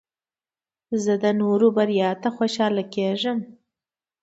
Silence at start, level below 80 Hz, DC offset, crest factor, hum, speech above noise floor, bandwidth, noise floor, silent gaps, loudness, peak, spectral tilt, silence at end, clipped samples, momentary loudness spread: 0.9 s; -72 dBFS; under 0.1%; 16 dB; none; over 69 dB; 8 kHz; under -90 dBFS; none; -22 LUFS; -6 dBFS; -6 dB/octave; 0.7 s; under 0.1%; 8 LU